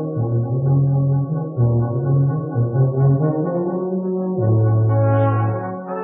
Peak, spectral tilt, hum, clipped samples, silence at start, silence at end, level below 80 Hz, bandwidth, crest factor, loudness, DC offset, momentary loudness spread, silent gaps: -6 dBFS; -9.5 dB/octave; none; under 0.1%; 0 s; 0 s; -48 dBFS; 2.9 kHz; 12 dB; -19 LUFS; under 0.1%; 6 LU; none